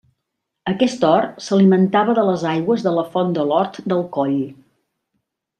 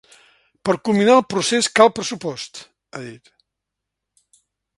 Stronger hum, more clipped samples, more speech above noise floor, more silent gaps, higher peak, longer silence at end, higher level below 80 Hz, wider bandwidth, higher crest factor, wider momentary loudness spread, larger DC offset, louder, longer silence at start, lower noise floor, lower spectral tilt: neither; neither; about the same, 61 dB vs 64 dB; neither; about the same, -2 dBFS vs 0 dBFS; second, 1.05 s vs 1.6 s; about the same, -62 dBFS vs -64 dBFS; second, 9.2 kHz vs 11.5 kHz; about the same, 16 dB vs 20 dB; second, 8 LU vs 21 LU; neither; about the same, -18 LUFS vs -17 LUFS; about the same, 0.65 s vs 0.65 s; second, -78 dBFS vs -82 dBFS; first, -7 dB/octave vs -3.5 dB/octave